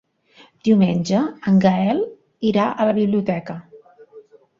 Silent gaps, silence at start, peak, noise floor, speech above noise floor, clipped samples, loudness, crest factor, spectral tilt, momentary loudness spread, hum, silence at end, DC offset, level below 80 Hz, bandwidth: none; 0.65 s; -4 dBFS; -52 dBFS; 34 dB; under 0.1%; -19 LUFS; 16 dB; -7.5 dB/octave; 11 LU; none; 0.4 s; under 0.1%; -58 dBFS; 7.4 kHz